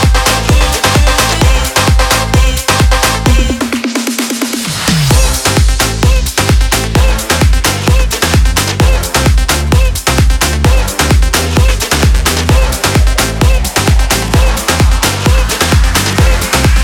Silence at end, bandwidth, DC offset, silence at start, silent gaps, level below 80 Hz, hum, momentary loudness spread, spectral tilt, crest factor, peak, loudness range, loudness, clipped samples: 0 s; 18.5 kHz; under 0.1%; 0 s; none; -12 dBFS; none; 2 LU; -4 dB/octave; 10 dB; 0 dBFS; 1 LU; -10 LUFS; under 0.1%